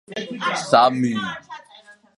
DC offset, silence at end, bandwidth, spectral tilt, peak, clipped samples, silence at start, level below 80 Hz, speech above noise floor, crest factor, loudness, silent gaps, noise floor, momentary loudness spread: under 0.1%; 0.25 s; 11.5 kHz; -4.5 dB/octave; 0 dBFS; under 0.1%; 0.1 s; -68 dBFS; 29 dB; 22 dB; -20 LUFS; none; -49 dBFS; 22 LU